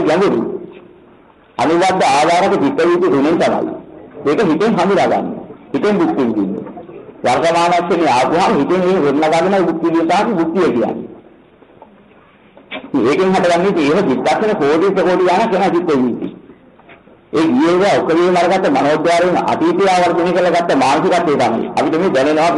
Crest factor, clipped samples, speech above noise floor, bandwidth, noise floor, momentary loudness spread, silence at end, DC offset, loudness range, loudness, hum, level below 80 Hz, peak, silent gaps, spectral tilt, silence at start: 8 dB; under 0.1%; 33 dB; 11.5 kHz; -46 dBFS; 9 LU; 0 s; under 0.1%; 4 LU; -14 LUFS; none; -52 dBFS; -6 dBFS; none; -5.5 dB/octave; 0 s